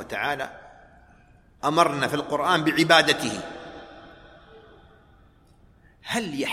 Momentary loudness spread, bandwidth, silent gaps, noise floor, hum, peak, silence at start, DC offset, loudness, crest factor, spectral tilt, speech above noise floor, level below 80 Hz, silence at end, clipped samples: 24 LU; 16 kHz; none; -56 dBFS; none; -2 dBFS; 0 s; under 0.1%; -22 LUFS; 24 dB; -3.5 dB/octave; 33 dB; -58 dBFS; 0 s; under 0.1%